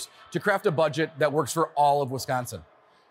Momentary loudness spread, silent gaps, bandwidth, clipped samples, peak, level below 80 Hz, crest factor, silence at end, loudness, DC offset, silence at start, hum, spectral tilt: 9 LU; none; 16 kHz; under 0.1%; -10 dBFS; -66 dBFS; 16 dB; 0.5 s; -25 LUFS; under 0.1%; 0 s; none; -5 dB/octave